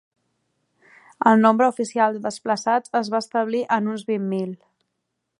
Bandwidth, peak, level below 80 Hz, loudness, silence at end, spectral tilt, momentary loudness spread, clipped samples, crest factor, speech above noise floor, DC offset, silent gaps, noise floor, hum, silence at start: 11 kHz; -2 dBFS; -76 dBFS; -21 LUFS; 0.85 s; -5.5 dB/octave; 11 LU; under 0.1%; 20 dB; 57 dB; under 0.1%; none; -78 dBFS; none; 1.2 s